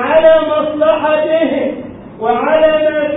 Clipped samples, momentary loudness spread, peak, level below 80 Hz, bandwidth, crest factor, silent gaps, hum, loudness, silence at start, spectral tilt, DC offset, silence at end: under 0.1%; 12 LU; 0 dBFS; -46 dBFS; 4 kHz; 12 dB; none; none; -12 LUFS; 0 s; -10.5 dB/octave; under 0.1%; 0 s